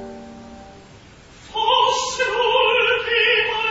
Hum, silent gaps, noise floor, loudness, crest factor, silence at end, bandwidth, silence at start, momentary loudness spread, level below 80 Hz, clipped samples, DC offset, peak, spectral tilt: none; none; -45 dBFS; -17 LUFS; 16 dB; 0 s; 8 kHz; 0 s; 18 LU; -52 dBFS; under 0.1%; under 0.1%; -4 dBFS; -1 dB/octave